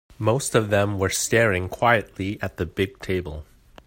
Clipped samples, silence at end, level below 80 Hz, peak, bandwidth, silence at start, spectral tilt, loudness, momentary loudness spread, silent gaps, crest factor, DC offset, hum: under 0.1%; 0.45 s; -48 dBFS; -4 dBFS; 16.5 kHz; 0.2 s; -4.5 dB/octave; -23 LUFS; 9 LU; none; 20 dB; under 0.1%; none